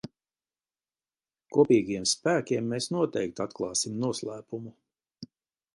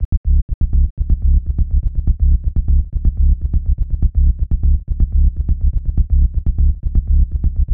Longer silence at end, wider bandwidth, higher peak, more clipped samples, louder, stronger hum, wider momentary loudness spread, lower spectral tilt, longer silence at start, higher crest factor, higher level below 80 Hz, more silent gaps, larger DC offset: first, 0.5 s vs 0 s; first, 11.5 kHz vs 0.9 kHz; second, -10 dBFS vs -4 dBFS; neither; second, -28 LUFS vs -19 LUFS; neither; first, 24 LU vs 3 LU; second, -4 dB/octave vs -14 dB/octave; about the same, 0.05 s vs 0 s; first, 20 dB vs 10 dB; second, -68 dBFS vs -14 dBFS; second, none vs 0.05-0.24 s, 0.42-0.48 s, 0.54-0.61 s, 0.90-0.97 s; second, under 0.1% vs 3%